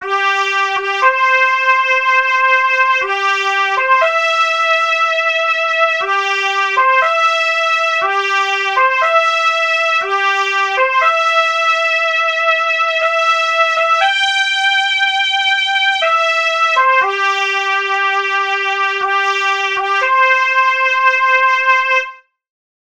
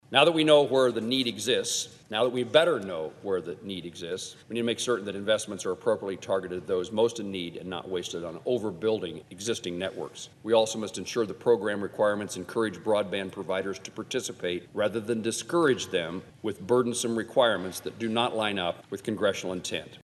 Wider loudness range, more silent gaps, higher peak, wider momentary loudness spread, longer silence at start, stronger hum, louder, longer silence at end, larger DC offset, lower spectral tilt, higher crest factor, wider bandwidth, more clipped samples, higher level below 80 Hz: second, 1 LU vs 4 LU; neither; first, 0 dBFS vs -4 dBFS; second, 3 LU vs 11 LU; about the same, 0 s vs 0.1 s; neither; first, -12 LUFS vs -28 LUFS; first, 0.8 s vs 0.05 s; first, 0.2% vs under 0.1%; second, 1 dB/octave vs -3.5 dB/octave; second, 14 dB vs 24 dB; first, 19 kHz vs 12.5 kHz; neither; about the same, -66 dBFS vs -68 dBFS